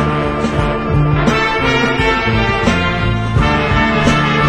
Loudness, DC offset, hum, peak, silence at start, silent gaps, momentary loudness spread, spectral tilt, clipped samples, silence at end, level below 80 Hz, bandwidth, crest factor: -14 LUFS; under 0.1%; none; 0 dBFS; 0 s; none; 4 LU; -6 dB/octave; under 0.1%; 0 s; -24 dBFS; 10.5 kHz; 14 dB